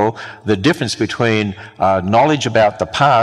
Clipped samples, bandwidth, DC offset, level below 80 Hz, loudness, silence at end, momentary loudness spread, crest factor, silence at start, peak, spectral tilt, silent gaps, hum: under 0.1%; 13 kHz; under 0.1%; -48 dBFS; -16 LUFS; 0 s; 6 LU; 14 dB; 0 s; 0 dBFS; -5.5 dB/octave; none; none